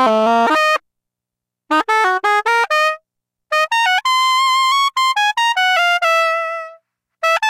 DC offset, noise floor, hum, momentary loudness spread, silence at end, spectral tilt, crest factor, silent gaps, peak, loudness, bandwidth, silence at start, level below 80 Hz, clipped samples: under 0.1%; -84 dBFS; none; 7 LU; 0 s; -1 dB/octave; 10 dB; none; -6 dBFS; -15 LUFS; 16 kHz; 0 s; -68 dBFS; under 0.1%